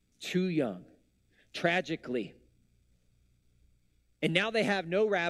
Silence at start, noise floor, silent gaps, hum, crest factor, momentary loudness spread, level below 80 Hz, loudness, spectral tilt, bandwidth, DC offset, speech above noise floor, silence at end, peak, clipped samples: 0.2 s; -70 dBFS; none; 60 Hz at -65 dBFS; 22 dB; 10 LU; -70 dBFS; -31 LUFS; -5.5 dB/octave; 13.5 kHz; under 0.1%; 40 dB; 0 s; -10 dBFS; under 0.1%